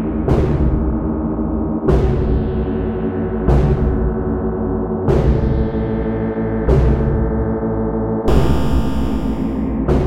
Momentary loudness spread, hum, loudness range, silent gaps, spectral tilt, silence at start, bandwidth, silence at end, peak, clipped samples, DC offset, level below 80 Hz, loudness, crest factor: 5 LU; none; 1 LU; none; -9.5 dB/octave; 0 s; 7.8 kHz; 0 s; 0 dBFS; under 0.1%; under 0.1%; -20 dBFS; -18 LUFS; 16 dB